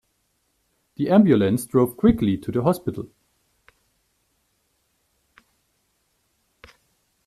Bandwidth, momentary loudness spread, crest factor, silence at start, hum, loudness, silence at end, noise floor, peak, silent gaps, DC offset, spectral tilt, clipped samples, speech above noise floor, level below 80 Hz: 14 kHz; 14 LU; 20 dB; 1 s; none; -20 LUFS; 4.2 s; -70 dBFS; -4 dBFS; none; under 0.1%; -7.5 dB/octave; under 0.1%; 51 dB; -48 dBFS